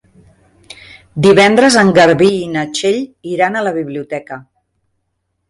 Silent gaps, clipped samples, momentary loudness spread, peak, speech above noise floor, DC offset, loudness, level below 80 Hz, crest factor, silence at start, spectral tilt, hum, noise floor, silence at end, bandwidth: none; under 0.1%; 16 LU; 0 dBFS; 57 dB; under 0.1%; -12 LUFS; -50 dBFS; 14 dB; 1.15 s; -4.5 dB/octave; none; -69 dBFS; 1.1 s; 11.5 kHz